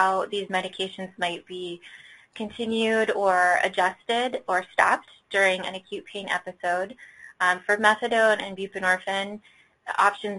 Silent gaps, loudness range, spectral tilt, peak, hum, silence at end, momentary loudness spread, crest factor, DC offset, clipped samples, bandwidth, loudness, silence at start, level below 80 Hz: none; 3 LU; -3 dB/octave; -2 dBFS; none; 0 s; 15 LU; 22 dB; under 0.1%; under 0.1%; 11.5 kHz; -24 LUFS; 0 s; -68 dBFS